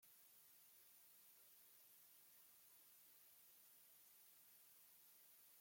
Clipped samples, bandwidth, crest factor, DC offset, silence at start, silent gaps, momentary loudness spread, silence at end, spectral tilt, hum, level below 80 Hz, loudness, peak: under 0.1%; 16.5 kHz; 14 dB; under 0.1%; 0 s; none; 0 LU; 0 s; 0.5 dB/octave; none; under -90 dBFS; -67 LUFS; -56 dBFS